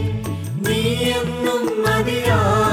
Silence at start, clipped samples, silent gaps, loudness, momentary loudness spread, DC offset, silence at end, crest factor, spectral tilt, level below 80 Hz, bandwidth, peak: 0 s; under 0.1%; none; -19 LUFS; 7 LU; under 0.1%; 0 s; 14 dB; -5.5 dB/octave; -38 dBFS; 18 kHz; -4 dBFS